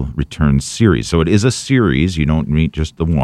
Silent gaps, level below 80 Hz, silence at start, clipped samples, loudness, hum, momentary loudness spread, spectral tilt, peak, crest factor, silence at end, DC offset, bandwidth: none; -26 dBFS; 0 s; under 0.1%; -15 LUFS; none; 5 LU; -6 dB/octave; 0 dBFS; 14 dB; 0 s; under 0.1%; 12.5 kHz